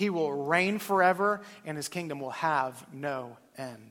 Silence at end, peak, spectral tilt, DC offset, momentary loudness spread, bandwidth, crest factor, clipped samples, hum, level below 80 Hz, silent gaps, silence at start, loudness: 0 s; -10 dBFS; -5 dB/octave; under 0.1%; 16 LU; 16.5 kHz; 20 dB; under 0.1%; none; -76 dBFS; none; 0 s; -29 LUFS